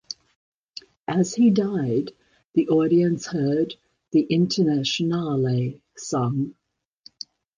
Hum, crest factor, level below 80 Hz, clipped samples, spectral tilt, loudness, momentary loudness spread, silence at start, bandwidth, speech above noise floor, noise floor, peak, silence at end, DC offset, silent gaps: none; 14 dB; -62 dBFS; under 0.1%; -6.5 dB/octave; -23 LUFS; 19 LU; 0.1 s; 9.8 kHz; 33 dB; -54 dBFS; -8 dBFS; 1.05 s; under 0.1%; 0.36-0.74 s, 0.99-1.05 s, 2.45-2.53 s